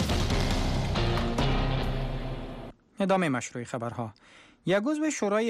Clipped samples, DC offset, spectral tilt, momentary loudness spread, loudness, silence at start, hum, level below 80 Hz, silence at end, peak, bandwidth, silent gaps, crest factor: under 0.1%; under 0.1%; -5.5 dB/octave; 12 LU; -29 LUFS; 0 s; none; -34 dBFS; 0 s; -16 dBFS; 14.5 kHz; none; 14 dB